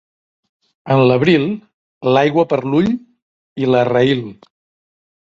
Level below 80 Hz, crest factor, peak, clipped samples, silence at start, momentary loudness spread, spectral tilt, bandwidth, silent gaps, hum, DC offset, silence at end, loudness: -56 dBFS; 16 dB; -2 dBFS; under 0.1%; 0.85 s; 12 LU; -8 dB/octave; 7.6 kHz; 1.74-2.01 s, 3.22-3.56 s; none; under 0.1%; 1.05 s; -15 LUFS